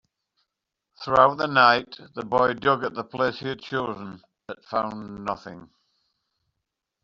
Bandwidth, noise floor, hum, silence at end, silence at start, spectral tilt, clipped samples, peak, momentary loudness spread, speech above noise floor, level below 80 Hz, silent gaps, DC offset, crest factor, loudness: 7.6 kHz; -83 dBFS; none; 1.4 s; 1 s; -2.5 dB/octave; under 0.1%; -2 dBFS; 20 LU; 59 dB; -60 dBFS; none; under 0.1%; 24 dB; -23 LUFS